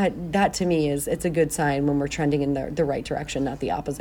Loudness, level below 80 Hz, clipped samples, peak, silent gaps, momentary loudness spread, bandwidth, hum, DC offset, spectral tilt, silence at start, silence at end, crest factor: -24 LUFS; -44 dBFS; under 0.1%; -8 dBFS; none; 6 LU; 17.5 kHz; none; under 0.1%; -5.5 dB/octave; 0 s; 0 s; 16 dB